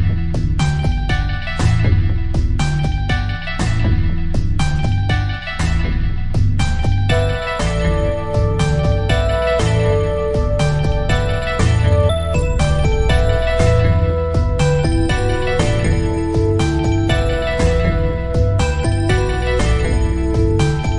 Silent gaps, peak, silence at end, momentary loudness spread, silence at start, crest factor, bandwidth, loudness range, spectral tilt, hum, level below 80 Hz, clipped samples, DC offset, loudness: none; -2 dBFS; 0 s; 4 LU; 0 s; 14 dB; 11 kHz; 3 LU; -6.5 dB/octave; none; -20 dBFS; under 0.1%; under 0.1%; -17 LUFS